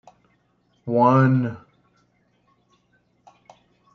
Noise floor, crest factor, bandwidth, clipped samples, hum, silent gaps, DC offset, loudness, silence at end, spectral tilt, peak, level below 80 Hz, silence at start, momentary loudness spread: -65 dBFS; 20 dB; 6.2 kHz; under 0.1%; none; none; under 0.1%; -19 LUFS; 2.4 s; -10 dB/octave; -4 dBFS; -70 dBFS; 0.85 s; 23 LU